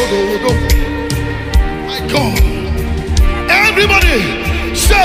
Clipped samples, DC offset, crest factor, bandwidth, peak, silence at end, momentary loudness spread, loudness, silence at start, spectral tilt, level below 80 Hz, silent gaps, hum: under 0.1%; under 0.1%; 12 dB; 16 kHz; 0 dBFS; 0 s; 9 LU; -13 LUFS; 0 s; -4.5 dB/octave; -16 dBFS; none; none